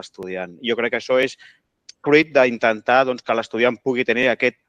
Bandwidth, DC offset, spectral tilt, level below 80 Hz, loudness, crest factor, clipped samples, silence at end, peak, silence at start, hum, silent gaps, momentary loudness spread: 9.4 kHz; under 0.1%; -5 dB/octave; -64 dBFS; -19 LUFS; 18 dB; under 0.1%; 0.15 s; -2 dBFS; 0.05 s; none; none; 11 LU